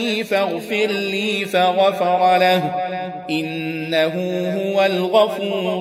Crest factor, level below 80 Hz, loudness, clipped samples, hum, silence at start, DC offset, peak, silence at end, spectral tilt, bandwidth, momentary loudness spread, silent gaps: 18 dB; -68 dBFS; -19 LUFS; under 0.1%; none; 0 s; under 0.1%; -2 dBFS; 0 s; -5 dB/octave; 16 kHz; 9 LU; none